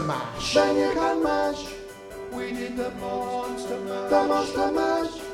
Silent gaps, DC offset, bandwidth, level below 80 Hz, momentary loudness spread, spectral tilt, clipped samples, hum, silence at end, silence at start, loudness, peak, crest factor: none; under 0.1%; 16.5 kHz; -50 dBFS; 12 LU; -4.5 dB/octave; under 0.1%; none; 0 s; 0 s; -25 LUFS; -6 dBFS; 18 dB